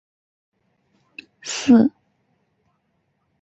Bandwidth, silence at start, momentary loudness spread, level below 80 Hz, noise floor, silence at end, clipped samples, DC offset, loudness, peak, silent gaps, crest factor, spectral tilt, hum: 8.2 kHz; 1.45 s; 27 LU; -62 dBFS; -70 dBFS; 1.5 s; under 0.1%; under 0.1%; -18 LUFS; -4 dBFS; none; 20 dB; -4.5 dB/octave; none